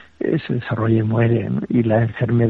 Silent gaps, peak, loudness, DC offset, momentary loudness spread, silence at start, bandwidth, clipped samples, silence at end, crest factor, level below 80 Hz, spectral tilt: none; -6 dBFS; -19 LUFS; under 0.1%; 5 LU; 0.2 s; 4.3 kHz; under 0.1%; 0 s; 12 dB; -50 dBFS; -11 dB/octave